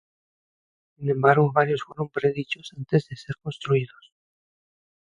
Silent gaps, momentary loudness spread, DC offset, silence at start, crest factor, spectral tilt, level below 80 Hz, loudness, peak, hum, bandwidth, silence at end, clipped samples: none; 15 LU; under 0.1%; 1 s; 22 dB; -7.5 dB/octave; -64 dBFS; -24 LUFS; -4 dBFS; none; 8.8 kHz; 1.2 s; under 0.1%